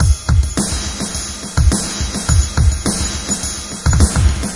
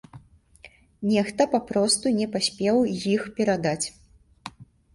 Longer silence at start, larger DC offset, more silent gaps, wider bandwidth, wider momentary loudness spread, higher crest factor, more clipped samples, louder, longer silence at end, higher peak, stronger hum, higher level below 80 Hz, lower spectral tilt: second, 0 s vs 0.15 s; first, 0.4% vs under 0.1%; neither; about the same, 11.5 kHz vs 11.5 kHz; second, 7 LU vs 15 LU; about the same, 16 dB vs 20 dB; neither; first, -17 LUFS vs -24 LUFS; second, 0 s vs 0.3 s; first, 0 dBFS vs -6 dBFS; neither; first, -20 dBFS vs -58 dBFS; about the same, -4 dB/octave vs -4 dB/octave